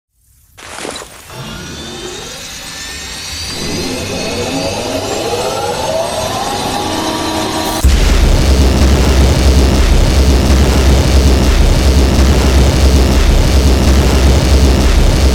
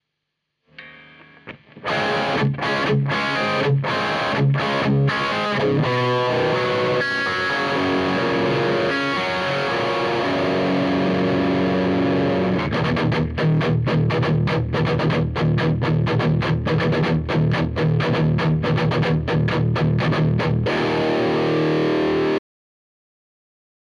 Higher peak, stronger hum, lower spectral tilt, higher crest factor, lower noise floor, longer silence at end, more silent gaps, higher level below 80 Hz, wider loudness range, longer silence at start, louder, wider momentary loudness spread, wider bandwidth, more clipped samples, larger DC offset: first, 0 dBFS vs -10 dBFS; neither; second, -5 dB/octave vs -7 dB/octave; about the same, 10 dB vs 12 dB; second, -48 dBFS vs -78 dBFS; second, 0 s vs 1.5 s; neither; first, -12 dBFS vs -42 dBFS; first, 11 LU vs 1 LU; second, 0.6 s vs 0.8 s; first, -12 LUFS vs -20 LUFS; first, 14 LU vs 2 LU; first, 16.5 kHz vs 9.8 kHz; neither; neither